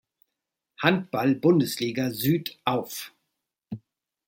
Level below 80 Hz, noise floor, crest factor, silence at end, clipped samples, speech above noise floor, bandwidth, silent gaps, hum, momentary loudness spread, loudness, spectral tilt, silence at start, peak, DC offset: -66 dBFS; -84 dBFS; 24 dB; 0.5 s; under 0.1%; 60 dB; 17 kHz; none; none; 20 LU; -25 LUFS; -5.5 dB/octave; 0.8 s; -4 dBFS; under 0.1%